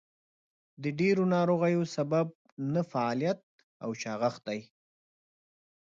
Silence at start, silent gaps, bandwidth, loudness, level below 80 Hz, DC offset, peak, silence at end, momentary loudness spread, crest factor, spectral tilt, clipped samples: 0.8 s; 2.35-2.45 s, 2.52-2.57 s, 3.43-3.58 s, 3.64-3.80 s; 7.6 kHz; -31 LUFS; -76 dBFS; under 0.1%; -16 dBFS; 1.35 s; 12 LU; 16 dB; -7 dB/octave; under 0.1%